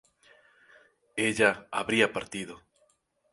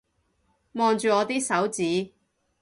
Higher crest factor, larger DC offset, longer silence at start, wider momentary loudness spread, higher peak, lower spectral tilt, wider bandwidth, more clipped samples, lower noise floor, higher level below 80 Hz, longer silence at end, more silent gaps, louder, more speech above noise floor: first, 26 dB vs 18 dB; neither; first, 1.15 s vs 0.75 s; first, 15 LU vs 10 LU; first, -6 dBFS vs -10 dBFS; about the same, -3.5 dB/octave vs -4 dB/octave; about the same, 11.5 kHz vs 11.5 kHz; neither; about the same, -70 dBFS vs -70 dBFS; about the same, -66 dBFS vs -68 dBFS; first, 0.75 s vs 0.55 s; neither; second, -28 LUFS vs -25 LUFS; second, 42 dB vs 46 dB